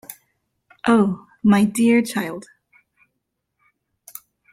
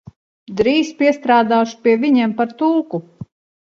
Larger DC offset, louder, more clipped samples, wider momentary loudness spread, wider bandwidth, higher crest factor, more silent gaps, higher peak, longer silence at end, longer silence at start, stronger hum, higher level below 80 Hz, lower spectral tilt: neither; second, -19 LUFS vs -16 LUFS; neither; first, 23 LU vs 9 LU; first, 16 kHz vs 7.4 kHz; about the same, 16 dB vs 16 dB; neither; second, -6 dBFS vs 0 dBFS; first, 2.1 s vs 0.45 s; second, 0.1 s vs 0.5 s; neither; second, -62 dBFS vs -54 dBFS; about the same, -6 dB/octave vs -5.5 dB/octave